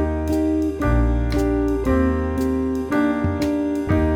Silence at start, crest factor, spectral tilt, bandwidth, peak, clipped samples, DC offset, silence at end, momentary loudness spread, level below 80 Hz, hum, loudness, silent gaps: 0 s; 14 dB; -8 dB/octave; 17.5 kHz; -6 dBFS; under 0.1%; under 0.1%; 0 s; 2 LU; -26 dBFS; none; -21 LUFS; none